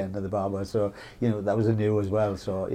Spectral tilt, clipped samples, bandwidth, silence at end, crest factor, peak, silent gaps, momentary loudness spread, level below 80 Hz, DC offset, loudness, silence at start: -8.5 dB/octave; under 0.1%; 10.5 kHz; 0 s; 14 dB; -12 dBFS; none; 6 LU; -54 dBFS; under 0.1%; -27 LUFS; 0 s